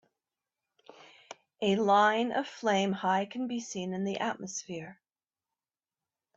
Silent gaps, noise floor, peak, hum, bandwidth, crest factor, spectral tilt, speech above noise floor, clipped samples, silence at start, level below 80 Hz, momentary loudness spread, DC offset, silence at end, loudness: none; under -90 dBFS; -14 dBFS; none; 8 kHz; 20 dB; -4.5 dB/octave; over 60 dB; under 0.1%; 1 s; -76 dBFS; 18 LU; under 0.1%; 1.45 s; -30 LUFS